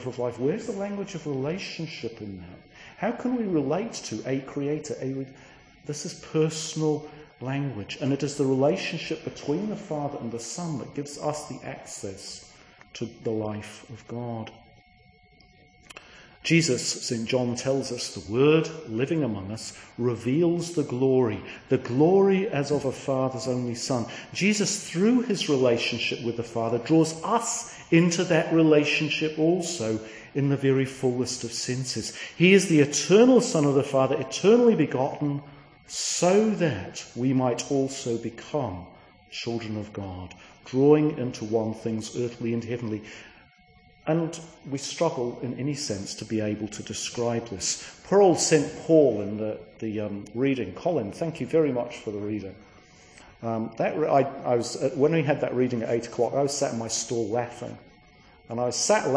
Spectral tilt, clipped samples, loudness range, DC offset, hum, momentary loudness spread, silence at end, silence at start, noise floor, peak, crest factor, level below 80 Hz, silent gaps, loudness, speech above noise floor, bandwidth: -5 dB/octave; under 0.1%; 9 LU; under 0.1%; none; 15 LU; 0 s; 0 s; -57 dBFS; -6 dBFS; 20 dB; -62 dBFS; none; -26 LUFS; 32 dB; 10.5 kHz